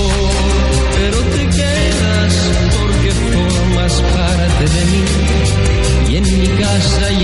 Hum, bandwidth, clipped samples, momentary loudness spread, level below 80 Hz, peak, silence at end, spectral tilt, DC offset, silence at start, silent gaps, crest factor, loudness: none; 11.5 kHz; under 0.1%; 1 LU; -16 dBFS; -2 dBFS; 0 s; -5 dB/octave; 0.7%; 0 s; none; 10 dB; -13 LUFS